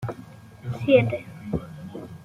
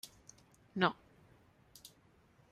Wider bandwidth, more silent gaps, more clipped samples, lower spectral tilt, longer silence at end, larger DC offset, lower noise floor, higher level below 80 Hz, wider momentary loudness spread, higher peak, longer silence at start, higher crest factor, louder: second, 12.5 kHz vs 15.5 kHz; neither; neither; first, -8 dB/octave vs -5 dB/octave; second, 0 s vs 0.65 s; neither; second, -45 dBFS vs -67 dBFS; first, -52 dBFS vs -74 dBFS; second, 19 LU vs 25 LU; first, -4 dBFS vs -16 dBFS; about the same, 0 s vs 0.05 s; second, 20 dB vs 26 dB; first, -24 LUFS vs -36 LUFS